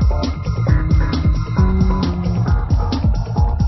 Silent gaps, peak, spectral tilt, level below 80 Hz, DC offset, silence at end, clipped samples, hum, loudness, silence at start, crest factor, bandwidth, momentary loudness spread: none; -2 dBFS; -8 dB/octave; -18 dBFS; under 0.1%; 0 s; under 0.1%; none; -18 LUFS; 0 s; 14 dB; 6 kHz; 3 LU